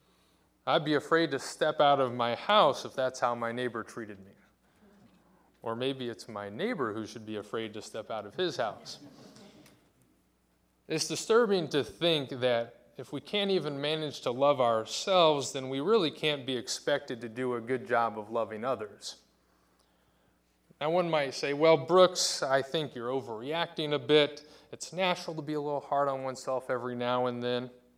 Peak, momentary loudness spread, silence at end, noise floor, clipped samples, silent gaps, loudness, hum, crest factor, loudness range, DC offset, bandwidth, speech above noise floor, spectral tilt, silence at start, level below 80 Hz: -8 dBFS; 15 LU; 0.25 s; -71 dBFS; under 0.1%; none; -30 LUFS; none; 22 dB; 10 LU; under 0.1%; 15.5 kHz; 41 dB; -4 dB/octave; 0.65 s; -74 dBFS